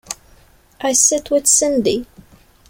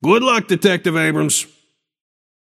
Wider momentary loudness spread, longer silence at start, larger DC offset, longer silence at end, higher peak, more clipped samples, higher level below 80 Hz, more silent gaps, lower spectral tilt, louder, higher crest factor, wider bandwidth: first, 15 LU vs 5 LU; about the same, 0.1 s vs 0 s; neither; second, 0.65 s vs 1.05 s; about the same, 0 dBFS vs 0 dBFS; neither; first, -50 dBFS vs -66 dBFS; neither; second, -2 dB/octave vs -4 dB/octave; about the same, -15 LUFS vs -16 LUFS; about the same, 18 dB vs 18 dB; about the same, 16.5 kHz vs 16 kHz